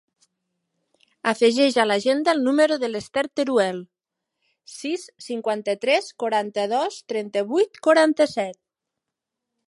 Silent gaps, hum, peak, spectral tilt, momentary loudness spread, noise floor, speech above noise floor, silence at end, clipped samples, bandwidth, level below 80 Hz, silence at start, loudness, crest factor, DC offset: none; none; -4 dBFS; -3.5 dB/octave; 12 LU; -84 dBFS; 63 dB; 1.15 s; under 0.1%; 11.5 kHz; -72 dBFS; 1.25 s; -22 LUFS; 20 dB; under 0.1%